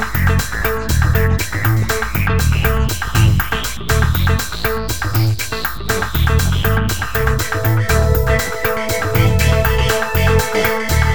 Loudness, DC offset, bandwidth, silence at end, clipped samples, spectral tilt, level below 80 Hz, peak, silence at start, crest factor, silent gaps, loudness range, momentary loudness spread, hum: -16 LUFS; 4%; over 20 kHz; 0 s; under 0.1%; -5 dB/octave; -22 dBFS; 0 dBFS; 0 s; 14 dB; none; 2 LU; 5 LU; none